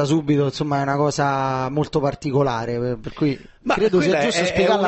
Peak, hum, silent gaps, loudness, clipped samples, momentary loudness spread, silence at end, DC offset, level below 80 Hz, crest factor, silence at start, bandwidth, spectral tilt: -6 dBFS; none; none; -21 LUFS; under 0.1%; 6 LU; 0 s; under 0.1%; -46 dBFS; 14 dB; 0 s; 8.6 kHz; -6 dB/octave